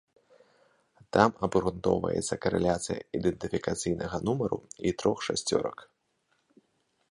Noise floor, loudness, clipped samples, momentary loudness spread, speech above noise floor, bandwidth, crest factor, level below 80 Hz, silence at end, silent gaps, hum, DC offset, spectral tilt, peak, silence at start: -74 dBFS; -29 LUFS; under 0.1%; 8 LU; 46 dB; 11.5 kHz; 26 dB; -54 dBFS; 1.25 s; none; none; under 0.1%; -5 dB/octave; -4 dBFS; 1.15 s